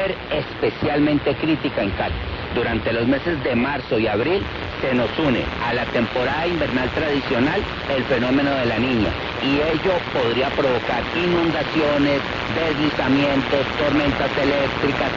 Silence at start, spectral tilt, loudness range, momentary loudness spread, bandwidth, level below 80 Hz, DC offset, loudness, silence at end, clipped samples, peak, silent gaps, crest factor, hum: 0 s; -6.5 dB/octave; 2 LU; 4 LU; 7.4 kHz; -38 dBFS; under 0.1%; -20 LUFS; 0 s; under 0.1%; -4 dBFS; none; 16 dB; none